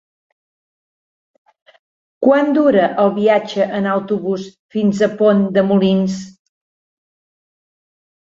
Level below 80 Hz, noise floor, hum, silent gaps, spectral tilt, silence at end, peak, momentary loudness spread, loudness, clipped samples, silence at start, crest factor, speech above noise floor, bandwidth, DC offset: -60 dBFS; under -90 dBFS; none; 4.59-4.69 s; -7 dB/octave; 2 s; -2 dBFS; 9 LU; -15 LUFS; under 0.1%; 2.2 s; 16 dB; over 75 dB; 7.6 kHz; under 0.1%